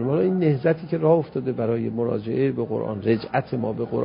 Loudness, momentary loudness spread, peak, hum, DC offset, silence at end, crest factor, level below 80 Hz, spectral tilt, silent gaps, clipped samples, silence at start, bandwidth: -23 LUFS; 6 LU; -6 dBFS; none; under 0.1%; 0 s; 18 dB; -56 dBFS; -12.5 dB/octave; none; under 0.1%; 0 s; 5.4 kHz